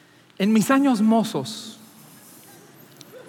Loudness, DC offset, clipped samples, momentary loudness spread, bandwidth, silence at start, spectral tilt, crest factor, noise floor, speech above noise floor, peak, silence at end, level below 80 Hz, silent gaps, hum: -20 LUFS; under 0.1%; under 0.1%; 16 LU; 17 kHz; 0.4 s; -5.5 dB/octave; 16 dB; -48 dBFS; 28 dB; -8 dBFS; 0.05 s; -82 dBFS; none; none